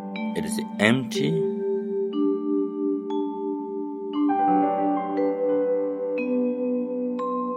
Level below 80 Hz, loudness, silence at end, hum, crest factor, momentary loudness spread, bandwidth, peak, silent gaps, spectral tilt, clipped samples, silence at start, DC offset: -70 dBFS; -25 LUFS; 0 s; none; 24 dB; 8 LU; 14 kHz; -2 dBFS; none; -6 dB/octave; under 0.1%; 0 s; under 0.1%